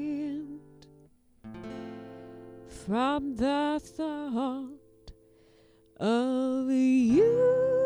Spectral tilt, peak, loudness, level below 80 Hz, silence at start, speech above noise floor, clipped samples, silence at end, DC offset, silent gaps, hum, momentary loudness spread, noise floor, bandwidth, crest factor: -6.5 dB/octave; -14 dBFS; -28 LUFS; -58 dBFS; 0 s; 34 dB; under 0.1%; 0 s; under 0.1%; none; none; 23 LU; -60 dBFS; 11 kHz; 14 dB